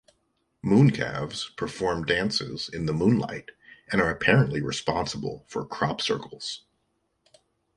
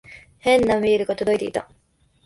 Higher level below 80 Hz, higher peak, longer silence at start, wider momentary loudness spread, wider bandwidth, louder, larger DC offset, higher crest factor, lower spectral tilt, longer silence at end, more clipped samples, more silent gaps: about the same, -52 dBFS vs -50 dBFS; about the same, -6 dBFS vs -6 dBFS; first, 0.65 s vs 0.1 s; first, 14 LU vs 10 LU; about the same, 11.5 kHz vs 11.5 kHz; second, -26 LUFS vs -21 LUFS; neither; first, 22 dB vs 16 dB; about the same, -5.5 dB/octave vs -5 dB/octave; first, 1.2 s vs 0.6 s; neither; neither